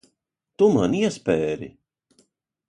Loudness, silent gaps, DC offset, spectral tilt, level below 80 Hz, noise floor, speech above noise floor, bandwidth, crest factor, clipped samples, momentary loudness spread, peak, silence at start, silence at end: -22 LUFS; none; under 0.1%; -6.5 dB/octave; -56 dBFS; -77 dBFS; 56 dB; 10.5 kHz; 18 dB; under 0.1%; 13 LU; -6 dBFS; 0.6 s; 1 s